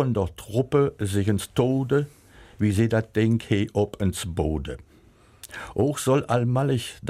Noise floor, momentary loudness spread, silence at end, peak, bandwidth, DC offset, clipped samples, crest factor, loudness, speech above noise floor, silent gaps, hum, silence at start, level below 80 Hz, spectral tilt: -54 dBFS; 10 LU; 0 s; -8 dBFS; 16 kHz; under 0.1%; under 0.1%; 16 dB; -24 LUFS; 31 dB; none; none; 0 s; -44 dBFS; -6.5 dB/octave